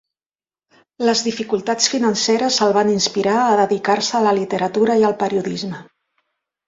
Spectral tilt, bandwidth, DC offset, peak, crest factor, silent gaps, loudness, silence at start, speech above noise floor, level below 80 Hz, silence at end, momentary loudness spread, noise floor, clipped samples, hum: -3.5 dB/octave; 7.8 kHz; under 0.1%; -2 dBFS; 18 dB; none; -17 LUFS; 1 s; over 73 dB; -62 dBFS; 0.85 s; 7 LU; under -90 dBFS; under 0.1%; none